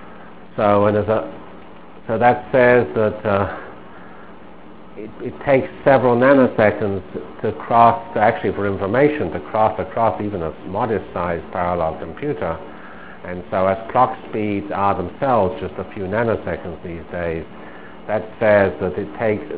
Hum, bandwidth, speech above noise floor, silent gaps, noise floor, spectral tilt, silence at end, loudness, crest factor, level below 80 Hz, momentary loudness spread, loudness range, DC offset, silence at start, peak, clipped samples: none; 4 kHz; 23 dB; none; -41 dBFS; -11 dB/octave; 0 s; -19 LUFS; 20 dB; -44 dBFS; 19 LU; 7 LU; 1%; 0 s; 0 dBFS; under 0.1%